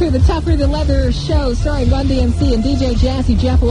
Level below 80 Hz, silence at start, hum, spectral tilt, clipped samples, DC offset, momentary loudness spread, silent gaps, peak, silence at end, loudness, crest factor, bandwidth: -16 dBFS; 0 s; none; -7.5 dB/octave; under 0.1%; under 0.1%; 2 LU; none; 0 dBFS; 0 s; -15 LUFS; 12 dB; 10 kHz